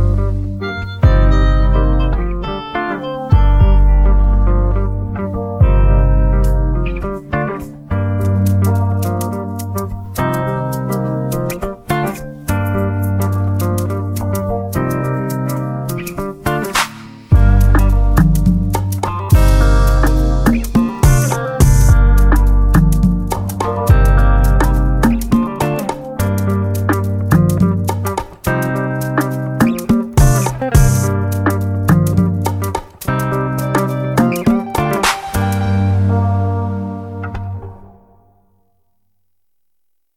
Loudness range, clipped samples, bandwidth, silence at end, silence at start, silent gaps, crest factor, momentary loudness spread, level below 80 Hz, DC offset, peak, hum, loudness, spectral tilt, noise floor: 6 LU; under 0.1%; 16 kHz; 2.3 s; 0 s; none; 14 dB; 10 LU; -16 dBFS; 0.1%; 0 dBFS; none; -16 LUFS; -6.5 dB/octave; -75 dBFS